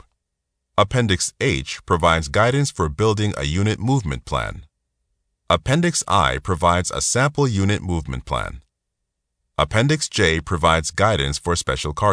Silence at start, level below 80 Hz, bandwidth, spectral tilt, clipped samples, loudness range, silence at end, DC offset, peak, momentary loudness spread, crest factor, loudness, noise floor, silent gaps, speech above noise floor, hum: 0.8 s; -36 dBFS; 11 kHz; -4.5 dB/octave; under 0.1%; 3 LU; 0 s; under 0.1%; -2 dBFS; 8 LU; 18 dB; -20 LUFS; -78 dBFS; none; 59 dB; none